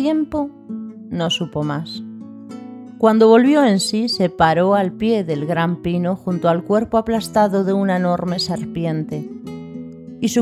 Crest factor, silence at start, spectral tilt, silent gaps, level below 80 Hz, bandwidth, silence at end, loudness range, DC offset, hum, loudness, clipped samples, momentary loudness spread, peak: 16 dB; 0 s; -6 dB/octave; none; -50 dBFS; 14.5 kHz; 0 s; 5 LU; under 0.1%; none; -18 LUFS; under 0.1%; 19 LU; -2 dBFS